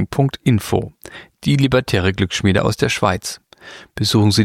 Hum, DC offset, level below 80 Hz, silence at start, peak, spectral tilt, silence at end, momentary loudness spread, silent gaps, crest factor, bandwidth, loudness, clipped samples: none; under 0.1%; -42 dBFS; 0 s; -2 dBFS; -5.5 dB/octave; 0 s; 19 LU; none; 16 dB; 16.5 kHz; -17 LUFS; under 0.1%